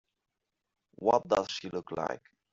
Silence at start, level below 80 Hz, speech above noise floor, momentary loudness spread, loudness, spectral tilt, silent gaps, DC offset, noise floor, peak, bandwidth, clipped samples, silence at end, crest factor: 1 s; -68 dBFS; 55 dB; 10 LU; -31 LUFS; -3 dB/octave; none; under 0.1%; -86 dBFS; -10 dBFS; 7.6 kHz; under 0.1%; 0.35 s; 22 dB